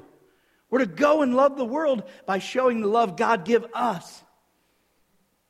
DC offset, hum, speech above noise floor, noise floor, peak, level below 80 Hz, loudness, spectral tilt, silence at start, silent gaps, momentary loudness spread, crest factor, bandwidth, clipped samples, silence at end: under 0.1%; none; 45 dB; -68 dBFS; -6 dBFS; -72 dBFS; -23 LUFS; -5.5 dB/octave; 0.7 s; none; 8 LU; 18 dB; 13.5 kHz; under 0.1%; 1.35 s